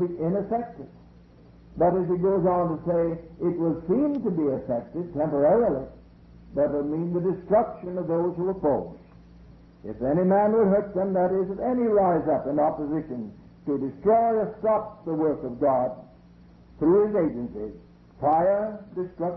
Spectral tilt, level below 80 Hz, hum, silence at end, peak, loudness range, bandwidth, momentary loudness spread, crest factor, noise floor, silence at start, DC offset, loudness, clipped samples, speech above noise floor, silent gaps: -12.5 dB/octave; -52 dBFS; none; 0 s; -10 dBFS; 3 LU; 4.9 kHz; 13 LU; 16 dB; -51 dBFS; 0 s; under 0.1%; -25 LUFS; under 0.1%; 27 dB; none